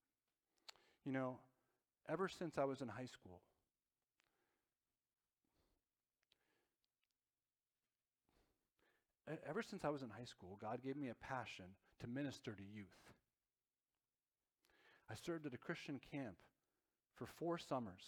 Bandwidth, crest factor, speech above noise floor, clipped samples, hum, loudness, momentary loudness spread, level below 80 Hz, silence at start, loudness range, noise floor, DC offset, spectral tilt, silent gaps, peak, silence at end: 17 kHz; 24 dB; over 41 dB; under 0.1%; none; -50 LUFS; 18 LU; -82 dBFS; 1.05 s; 8 LU; under -90 dBFS; under 0.1%; -6 dB/octave; none; -28 dBFS; 0 s